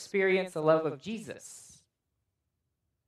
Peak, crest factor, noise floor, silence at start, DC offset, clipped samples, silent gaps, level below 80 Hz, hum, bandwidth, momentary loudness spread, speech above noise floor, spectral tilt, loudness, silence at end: -10 dBFS; 22 dB; -82 dBFS; 0 s; under 0.1%; under 0.1%; none; -78 dBFS; none; 13 kHz; 19 LU; 53 dB; -5.5 dB/octave; -29 LUFS; 1.45 s